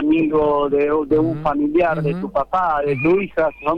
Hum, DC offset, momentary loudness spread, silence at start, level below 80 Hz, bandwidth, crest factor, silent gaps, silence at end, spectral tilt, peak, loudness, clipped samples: none; under 0.1%; 4 LU; 0 s; -42 dBFS; 5.4 kHz; 12 dB; none; 0 s; -9 dB/octave; -6 dBFS; -18 LUFS; under 0.1%